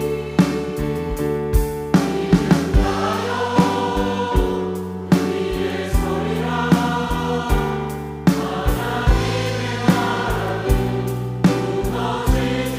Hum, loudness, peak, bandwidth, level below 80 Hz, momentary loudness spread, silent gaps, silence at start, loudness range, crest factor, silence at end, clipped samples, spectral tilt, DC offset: none; -20 LUFS; -4 dBFS; 16 kHz; -26 dBFS; 5 LU; none; 0 s; 2 LU; 16 dB; 0 s; under 0.1%; -6.5 dB/octave; under 0.1%